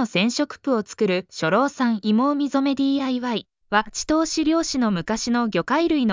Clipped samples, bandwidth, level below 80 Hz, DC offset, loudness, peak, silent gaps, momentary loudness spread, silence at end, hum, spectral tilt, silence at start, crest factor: under 0.1%; 7.6 kHz; -54 dBFS; under 0.1%; -22 LUFS; -6 dBFS; none; 4 LU; 0 s; none; -4.5 dB/octave; 0 s; 14 dB